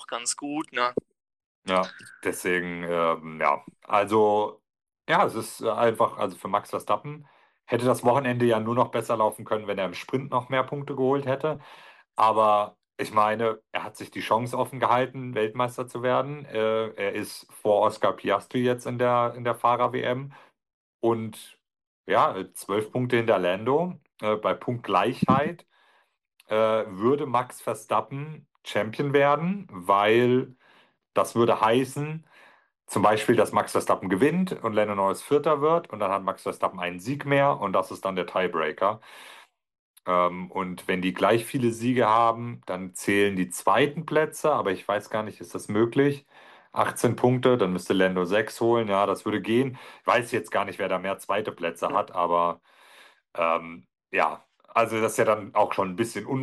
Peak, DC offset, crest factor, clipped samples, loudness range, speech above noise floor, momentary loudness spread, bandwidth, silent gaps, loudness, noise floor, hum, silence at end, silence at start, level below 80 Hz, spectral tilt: -8 dBFS; under 0.1%; 18 dB; under 0.1%; 3 LU; 40 dB; 10 LU; 12.5 kHz; 1.46-1.62 s, 20.74-20.99 s, 21.87-22.04 s, 39.79-39.94 s; -25 LUFS; -65 dBFS; none; 0 s; 0 s; -68 dBFS; -5.5 dB/octave